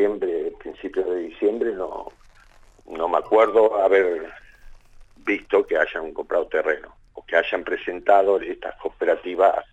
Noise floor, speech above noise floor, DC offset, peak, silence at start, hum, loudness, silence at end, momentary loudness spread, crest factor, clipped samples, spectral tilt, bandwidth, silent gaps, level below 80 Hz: -51 dBFS; 30 dB; under 0.1%; -4 dBFS; 0 s; none; -22 LUFS; 0.1 s; 14 LU; 18 dB; under 0.1%; -5 dB/octave; 8 kHz; none; -52 dBFS